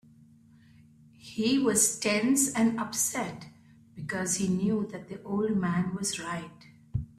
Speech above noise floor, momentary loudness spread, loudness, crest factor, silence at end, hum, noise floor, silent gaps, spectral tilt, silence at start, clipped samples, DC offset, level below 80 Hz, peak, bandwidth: 29 dB; 14 LU; -28 LUFS; 20 dB; 0.1 s; none; -57 dBFS; none; -4 dB/octave; 1.25 s; under 0.1%; under 0.1%; -56 dBFS; -10 dBFS; 16 kHz